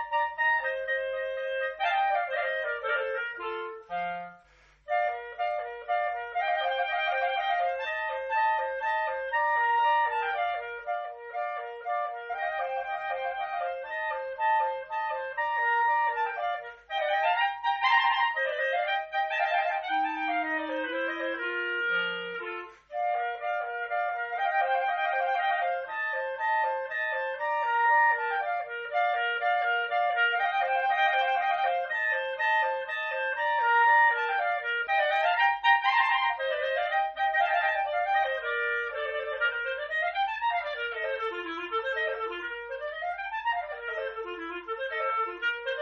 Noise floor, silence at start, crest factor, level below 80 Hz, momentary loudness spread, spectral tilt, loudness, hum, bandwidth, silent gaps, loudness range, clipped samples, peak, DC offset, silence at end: -60 dBFS; 0 s; 18 dB; -68 dBFS; 10 LU; 2.5 dB/octave; -28 LUFS; none; 6.8 kHz; none; 7 LU; under 0.1%; -10 dBFS; under 0.1%; 0 s